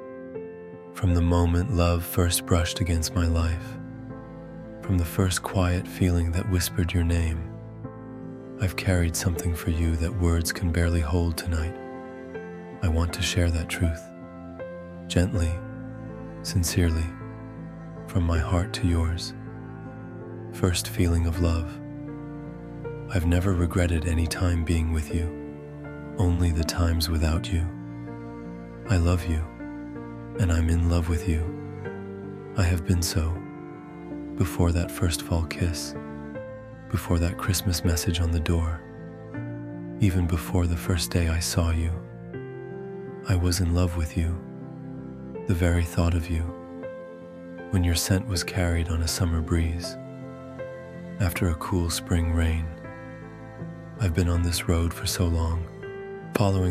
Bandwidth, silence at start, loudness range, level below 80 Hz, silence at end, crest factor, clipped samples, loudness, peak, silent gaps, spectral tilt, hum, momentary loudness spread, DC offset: 15.5 kHz; 0 s; 3 LU; -34 dBFS; 0 s; 20 dB; under 0.1%; -26 LUFS; -6 dBFS; none; -5.5 dB/octave; none; 15 LU; under 0.1%